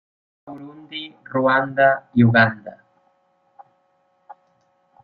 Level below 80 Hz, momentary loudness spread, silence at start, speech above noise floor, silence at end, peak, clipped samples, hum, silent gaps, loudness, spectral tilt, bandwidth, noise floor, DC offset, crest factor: -58 dBFS; 24 LU; 0.45 s; 46 dB; 2.35 s; -2 dBFS; under 0.1%; none; none; -17 LUFS; -10 dB/octave; 5.2 kHz; -64 dBFS; under 0.1%; 20 dB